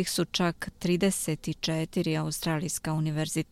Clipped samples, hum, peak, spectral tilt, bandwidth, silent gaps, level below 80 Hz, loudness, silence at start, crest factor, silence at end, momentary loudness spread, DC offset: under 0.1%; none; -12 dBFS; -4.5 dB/octave; 16 kHz; none; -54 dBFS; -29 LUFS; 0 s; 16 dB; 0.1 s; 4 LU; under 0.1%